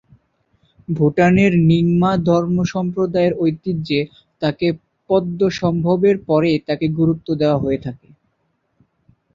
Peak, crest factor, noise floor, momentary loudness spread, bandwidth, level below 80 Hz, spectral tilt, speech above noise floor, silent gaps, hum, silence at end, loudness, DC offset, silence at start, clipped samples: -2 dBFS; 16 dB; -68 dBFS; 9 LU; 7.4 kHz; -48 dBFS; -8 dB/octave; 51 dB; none; none; 1.4 s; -17 LUFS; under 0.1%; 0.9 s; under 0.1%